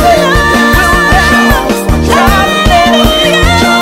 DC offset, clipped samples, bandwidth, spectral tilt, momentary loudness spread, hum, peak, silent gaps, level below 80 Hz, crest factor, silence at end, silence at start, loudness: under 0.1%; 0.5%; 16.5 kHz; -4.5 dB/octave; 3 LU; none; 0 dBFS; none; -16 dBFS; 6 dB; 0 s; 0 s; -7 LUFS